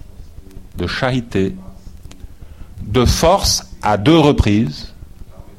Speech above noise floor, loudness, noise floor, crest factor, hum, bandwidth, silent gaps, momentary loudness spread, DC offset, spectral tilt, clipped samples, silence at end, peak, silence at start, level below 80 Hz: 21 dB; -15 LUFS; -35 dBFS; 16 dB; none; 16.5 kHz; none; 21 LU; under 0.1%; -5 dB/octave; under 0.1%; 0.05 s; 0 dBFS; 0.05 s; -28 dBFS